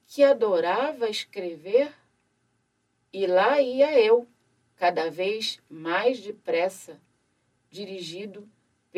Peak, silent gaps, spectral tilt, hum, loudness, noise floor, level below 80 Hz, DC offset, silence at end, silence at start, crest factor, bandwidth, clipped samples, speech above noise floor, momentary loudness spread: -8 dBFS; none; -4 dB/octave; none; -24 LUFS; -73 dBFS; -82 dBFS; under 0.1%; 0 s; 0.1 s; 18 dB; 13.5 kHz; under 0.1%; 49 dB; 16 LU